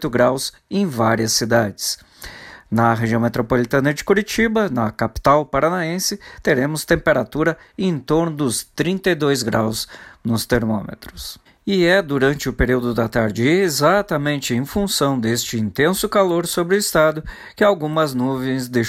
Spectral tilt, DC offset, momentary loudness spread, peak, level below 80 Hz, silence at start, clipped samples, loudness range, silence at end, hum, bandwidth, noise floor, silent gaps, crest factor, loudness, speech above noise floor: -4.5 dB/octave; under 0.1%; 8 LU; -4 dBFS; -40 dBFS; 0 s; under 0.1%; 2 LU; 0 s; none; 16.5 kHz; -38 dBFS; none; 16 dB; -19 LUFS; 19 dB